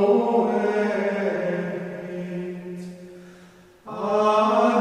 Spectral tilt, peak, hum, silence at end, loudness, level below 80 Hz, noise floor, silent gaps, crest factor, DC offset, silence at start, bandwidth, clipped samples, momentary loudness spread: -6.5 dB/octave; -8 dBFS; none; 0 s; -23 LUFS; -66 dBFS; -50 dBFS; none; 16 dB; under 0.1%; 0 s; 10 kHz; under 0.1%; 18 LU